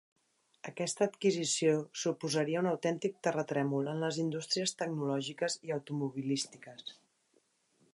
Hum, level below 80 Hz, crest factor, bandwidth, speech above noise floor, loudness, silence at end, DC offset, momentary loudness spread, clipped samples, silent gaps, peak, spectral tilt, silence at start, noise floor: none; -84 dBFS; 18 dB; 11.5 kHz; 40 dB; -34 LUFS; 1 s; under 0.1%; 10 LU; under 0.1%; none; -18 dBFS; -4.5 dB/octave; 0.65 s; -74 dBFS